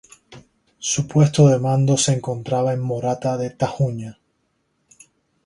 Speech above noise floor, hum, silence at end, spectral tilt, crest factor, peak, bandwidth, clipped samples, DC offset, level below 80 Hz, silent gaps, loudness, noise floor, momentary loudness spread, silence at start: 50 dB; none; 1.35 s; -5.5 dB/octave; 18 dB; -2 dBFS; 11.5 kHz; under 0.1%; under 0.1%; -54 dBFS; none; -19 LUFS; -69 dBFS; 10 LU; 0.3 s